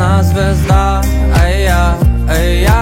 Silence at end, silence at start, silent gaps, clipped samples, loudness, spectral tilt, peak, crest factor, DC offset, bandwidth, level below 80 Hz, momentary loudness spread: 0 s; 0 s; none; under 0.1%; -12 LUFS; -6 dB/octave; 0 dBFS; 10 dB; under 0.1%; 16.5 kHz; -12 dBFS; 2 LU